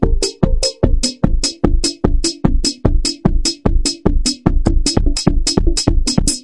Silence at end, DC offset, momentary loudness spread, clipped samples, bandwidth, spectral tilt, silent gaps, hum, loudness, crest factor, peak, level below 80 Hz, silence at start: 0 s; under 0.1%; 2 LU; under 0.1%; 11.5 kHz; -4.5 dB/octave; none; none; -17 LUFS; 14 dB; 0 dBFS; -16 dBFS; 0 s